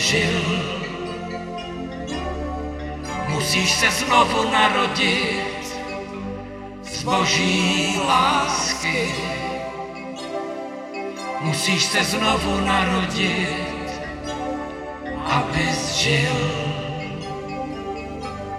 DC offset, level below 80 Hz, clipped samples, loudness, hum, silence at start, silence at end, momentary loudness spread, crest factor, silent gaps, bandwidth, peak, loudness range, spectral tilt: under 0.1%; -42 dBFS; under 0.1%; -22 LUFS; none; 0 s; 0 s; 14 LU; 20 dB; none; 15.5 kHz; -2 dBFS; 5 LU; -3.5 dB/octave